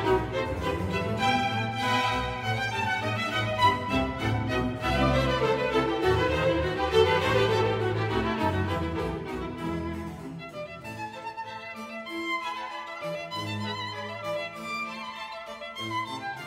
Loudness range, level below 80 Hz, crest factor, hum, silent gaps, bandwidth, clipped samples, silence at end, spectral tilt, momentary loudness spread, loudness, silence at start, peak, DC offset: 10 LU; -44 dBFS; 18 dB; none; none; 16 kHz; under 0.1%; 0 s; -5.5 dB/octave; 14 LU; -28 LUFS; 0 s; -10 dBFS; under 0.1%